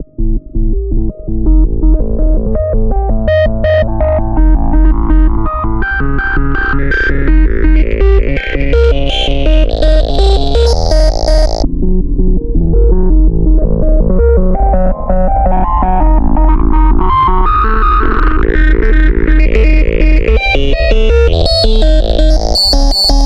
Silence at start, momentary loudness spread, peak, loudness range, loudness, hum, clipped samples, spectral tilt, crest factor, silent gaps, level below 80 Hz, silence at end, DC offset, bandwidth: 0 s; 5 LU; 0 dBFS; 2 LU; -12 LUFS; none; under 0.1%; -6 dB/octave; 8 dB; none; -10 dBFS; 0 s; under 0.1%; 9.6 kHz